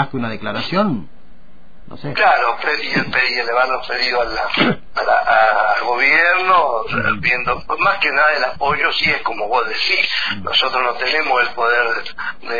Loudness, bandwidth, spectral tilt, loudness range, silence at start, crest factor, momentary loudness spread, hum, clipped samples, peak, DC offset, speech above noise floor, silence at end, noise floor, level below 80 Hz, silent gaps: -16 LUFS; 5 kHz; -5 dB/octave; 3 LU; 0 s; 16 dB; 8 LU; none; under 0.1%; -2 dBFS; 3%; 30 dB; 0 s; -47 dBFS; -46 dBFS; none